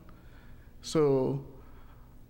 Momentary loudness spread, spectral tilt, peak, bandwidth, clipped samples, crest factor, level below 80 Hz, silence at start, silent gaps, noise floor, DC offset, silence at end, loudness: 19 LU; -6.5 dB/octave; -14 dBFS; 16.5 kHz; under 0.1%; 18 dB; -52 dBFS; 0.1 s; none; -51 dBFS; under 0.1%; 0.05 s; -29 LUFS